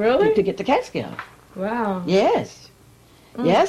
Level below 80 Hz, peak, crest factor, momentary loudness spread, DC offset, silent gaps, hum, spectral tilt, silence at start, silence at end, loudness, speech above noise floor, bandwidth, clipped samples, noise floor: -54 dBFS; -8 dBFS; 14 dB; 18 LU; under 0.1%; none; none; -6 dB/octave; 0 s; 0 s; -21 LUFS; 31 dB; 13.5 kHz; under 0.1%; -51 dBFS